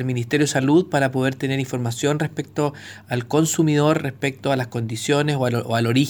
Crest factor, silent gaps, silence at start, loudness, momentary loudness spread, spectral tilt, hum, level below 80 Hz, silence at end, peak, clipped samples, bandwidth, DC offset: 16 dB; none; 0 s; -21 LUFS; 8 LU; -5.5 dB/octave; none; -62 dBFS; 0 s; -4 dBFS; under 0.1%; over 20 kHz; under 0.1%